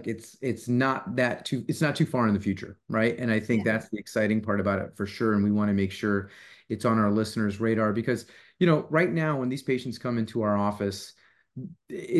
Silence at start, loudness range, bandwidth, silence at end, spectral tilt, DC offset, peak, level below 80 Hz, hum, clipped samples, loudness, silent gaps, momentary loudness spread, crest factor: 0 s; 1 LU; 12.5 kHz; 0 s; -6.5 dB/octave; under 0.1%; -8 dBFS; -56 dBFS; none; under 0.1%; -27 LUFS; none; 11 LU; 18 dB